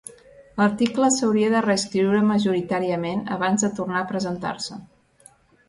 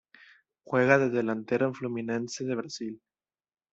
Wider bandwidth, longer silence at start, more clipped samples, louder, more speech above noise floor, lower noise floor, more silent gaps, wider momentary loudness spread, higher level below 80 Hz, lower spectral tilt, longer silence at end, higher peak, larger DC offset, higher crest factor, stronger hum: first, 11.5 kHz vs 8 kHz; second, 0.4 s vs 0.7 s; neither; first, -22 LUFS vs -28 LUFS; second, 33 dB vs over 62 dB; second, -54 dBFS vs under -90 dBFS; neither; second, 11 LU vs 15 LU; first, -60 dBFS vs -72 dBFS; second, -4.5 dB/octave vs -6 dB/octave; about the same, 0.85 s vs 0.75 s; about the same, -8 dBFS vs -6 dBFS; neither; second, 16 dB vs 24 dB; neither